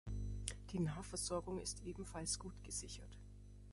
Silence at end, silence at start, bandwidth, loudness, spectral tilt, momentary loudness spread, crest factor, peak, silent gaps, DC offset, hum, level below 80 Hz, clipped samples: 0 s; 0.05 s; 12 kHz; -45 LUFS; -4 dB/octave; 15 LU; 26 dB; -20 dBFS; none; under 0.1%; 50 Hz at -55 dBFS; -54 dBFS; under 0.1%